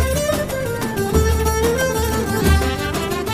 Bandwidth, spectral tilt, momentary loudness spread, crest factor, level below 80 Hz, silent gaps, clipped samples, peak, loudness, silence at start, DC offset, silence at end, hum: 16 kHz; -5 dB/octave; 5 LU; 16 dB; -24 dBFS; none; under 0.1%; -2 dBFS; -19 LUFS; 0 s; under 0.1%; 0 s; none